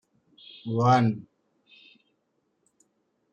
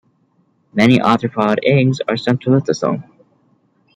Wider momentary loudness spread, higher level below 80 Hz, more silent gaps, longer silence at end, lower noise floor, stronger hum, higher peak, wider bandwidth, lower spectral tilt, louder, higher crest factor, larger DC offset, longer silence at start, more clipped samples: first, 21 LU vs 8 LU; second, -70 dBFS vs -56 dBFS; neither; first, 2.1 s vs 0.95 s; first, -75 dBFS vs -60 dBFS; neither; second, -10 dBFS vs -2 dBFS; second, 7.4 kHz vs 9.6 kHz; about the same, -7.5 dB/octave vs -7 dB/octave; second, -24 LUFS vs -16 LUFS; about the same, 20 dB vs 16 dB; neither; about the same, 0.65 s vs 0.75 s; neither